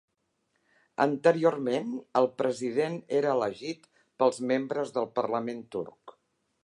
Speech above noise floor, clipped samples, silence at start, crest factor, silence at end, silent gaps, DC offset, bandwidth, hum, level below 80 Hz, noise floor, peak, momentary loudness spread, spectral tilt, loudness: 49 dB; under 0.1%; 1 s; 22 dB; 0.55 s; none; under 0.1%; 11 kHz; none; -78 dBFS; -77 dBFS; -8 dBFS; 13 LU; -6 dB/octave; -29 LUFS